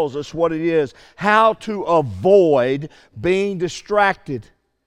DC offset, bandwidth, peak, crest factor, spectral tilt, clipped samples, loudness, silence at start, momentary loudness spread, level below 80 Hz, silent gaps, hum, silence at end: under 0.1%; 10.5 kHz; -2 dBFS; 18 dB; -6 dB/octave; under 0.1%; -18 LUFS; 0 s; 13 LU; -52 dBFS; none; none; 0.45 s